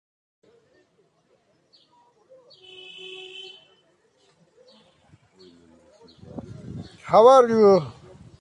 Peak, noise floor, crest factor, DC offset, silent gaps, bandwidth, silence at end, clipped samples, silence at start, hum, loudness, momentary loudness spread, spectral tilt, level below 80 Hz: -4 dBFS; -65 dBFS; 22 dB; under 0.1%; none; 10.5 kHz; 0.5 s; under 0.1%; 3.4 s; none; -16 LUFS; 28 LU; -6 dB/octave; -60 dBFS